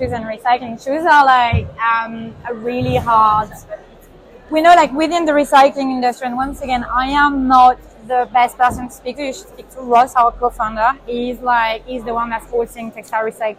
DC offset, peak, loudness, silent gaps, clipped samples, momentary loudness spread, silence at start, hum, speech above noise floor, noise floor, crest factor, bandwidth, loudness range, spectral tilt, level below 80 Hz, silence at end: under 0.1%; 0 dBFS; -15 LUFS; none; under 0.1%; 16 LU; 0 s; none; 27 dB; -42 dBFS; 16 dB; 15.5 kHz; 3 LU; -5 dB/octave; -40 dBFS; 0.05 s